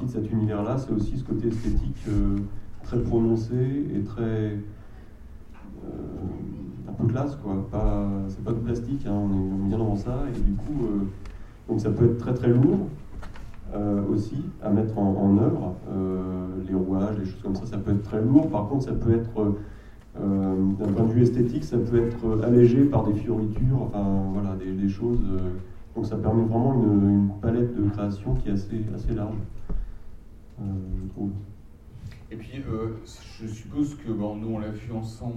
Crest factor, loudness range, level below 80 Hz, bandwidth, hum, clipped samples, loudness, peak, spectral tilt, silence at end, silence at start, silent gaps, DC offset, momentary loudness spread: 20 dB; 10 LU; -36 dBFS; 8.6 kHz; none; under 0.1%; -26 LUFS; -4 dBFS; -10 dB/octave; 0 s; 0 s; none; under 0.1%; 17 LU